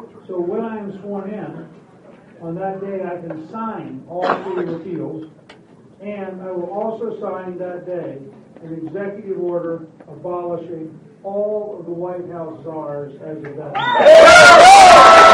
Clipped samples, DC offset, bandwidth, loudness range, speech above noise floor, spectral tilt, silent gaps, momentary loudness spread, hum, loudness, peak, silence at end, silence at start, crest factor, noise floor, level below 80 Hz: 0.5%; under 0.1%; 15.5 kHz; 17 LU; 30 dB; -3 dB/octave; none; 27 LU; none; -9 LUFS; 0 dBFS; 0 s; 0.3 s; 14 dB; -45 dBFS; -48 dBFS